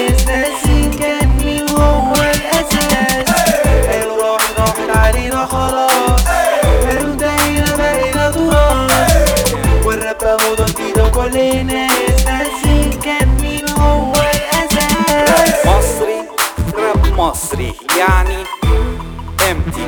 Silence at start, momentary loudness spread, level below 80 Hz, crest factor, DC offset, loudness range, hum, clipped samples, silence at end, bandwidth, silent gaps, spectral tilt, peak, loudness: 0 s; 5 LU; -18 dBFS; 12 dB; under 0.1%; 1 LU; none; under 0.1%; 0 s; over 20 kHz; none; -4.5 dB/octave; 0 dBFS; -13 LUFS